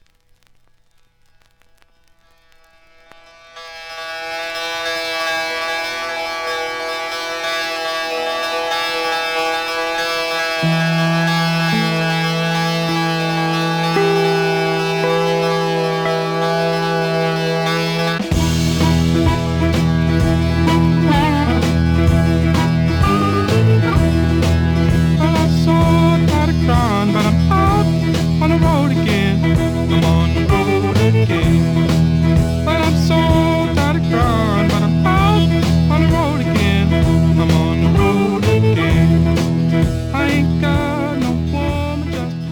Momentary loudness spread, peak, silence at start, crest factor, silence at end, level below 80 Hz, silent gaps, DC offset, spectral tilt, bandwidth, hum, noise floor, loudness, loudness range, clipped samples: 6 LU; 0 dBFS; 3.55 s; 14 dB; 0 s; -30 dBFS; none; under 0.1%; -6.5 dB/octave; 17.5 kHz; none; -53 dBFS; -16 LUFS; 6 LU; under 0.1%